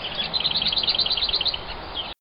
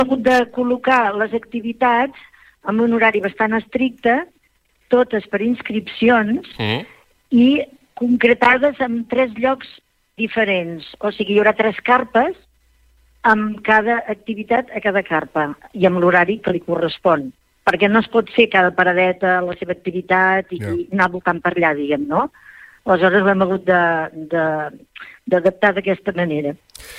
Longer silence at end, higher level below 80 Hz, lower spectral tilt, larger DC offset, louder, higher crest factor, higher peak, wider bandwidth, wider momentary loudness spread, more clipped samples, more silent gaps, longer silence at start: about the same, 0.05 s vs 0 s; first, -44 dBFS vs -54 dBFS; about the same, -5.5 dB/octave vs -6.5 dB/octave; neither; second, -22 LUFS vs -17 LUFS; about the same, 16 dB vs 16 dB; second, -8 dBFS vs -2 dBFS; second, 5.6 kHz vs 12.5 kHz; about the same, 11 LU vs 11 LU; neither; neither; about the same, 0 s vs 0 s